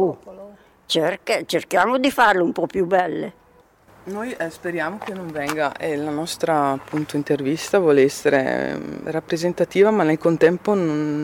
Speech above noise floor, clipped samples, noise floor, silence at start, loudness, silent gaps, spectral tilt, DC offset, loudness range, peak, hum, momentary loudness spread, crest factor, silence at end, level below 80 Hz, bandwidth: 33 dB; under 0.1%; -53 dBFS; 0 s; -21 LUFS; none; -5 dB/octave; under 0.1%; 6 LU; -4 dBFS; none; 11 LU; 16 dB; 0 s; -58 dBFS; 17 kHz